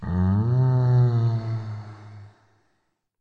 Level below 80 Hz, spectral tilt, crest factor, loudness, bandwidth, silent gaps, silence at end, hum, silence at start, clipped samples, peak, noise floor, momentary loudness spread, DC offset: -50 dBFS; -10.5 dB/octave; 12 dB; -22 LUFS; 4.7 kHz; none; 0.95 s; none; 0 s; under 0.1%; -10 dBFS; -72 dBFS; 19 LU; under 0.1%